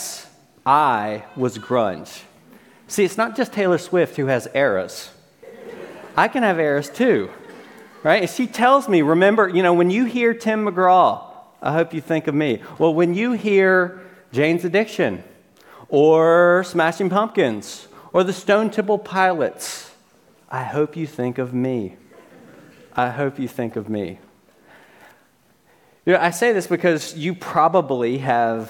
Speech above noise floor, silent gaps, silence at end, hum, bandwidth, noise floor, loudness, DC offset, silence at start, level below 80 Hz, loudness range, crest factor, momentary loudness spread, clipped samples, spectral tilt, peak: 40 dB; none; 0 s; none; 17.5 kHz; -58 dBFS; -19 LUFS; under 0.1%; 0 s; -68 dBFS; 9 LU; 18 dB; 15 LU; under 0.1%; -5.5 dB/octave; 0 dBFS